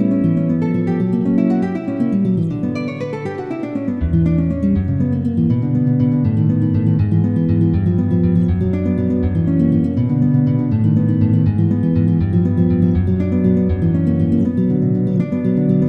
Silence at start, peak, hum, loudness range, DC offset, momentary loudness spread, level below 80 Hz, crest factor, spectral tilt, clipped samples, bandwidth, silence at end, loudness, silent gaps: 0 s; -4 dBFS; none; 3 LU; under 0.1%; 4 LU; -34 dBFS; 12 dB; -11 dB/octave; under 0.1%; 4.7 kHz; 0 s; -17 LUFS; none